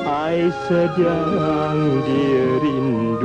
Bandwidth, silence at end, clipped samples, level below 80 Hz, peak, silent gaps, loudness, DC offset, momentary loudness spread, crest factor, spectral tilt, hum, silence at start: 9.4 kHz; 0 s; under 0.1%; -48 dBFS; -6 dBFS; none; -19 LUFS; under 0.1%; 3 LU; 12 dB; -8 dB/octave; none; 0 s